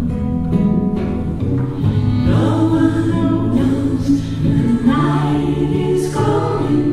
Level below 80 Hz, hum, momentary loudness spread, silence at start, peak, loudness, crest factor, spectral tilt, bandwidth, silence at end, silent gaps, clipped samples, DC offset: -30 dBFS; none; 5 LU; 0 s; -2 dBFS; -16 LUFS; 14 dB; -8.5 dB/octave; 12.5 kHz; 0 s; none; under 0.1%; under 0.1%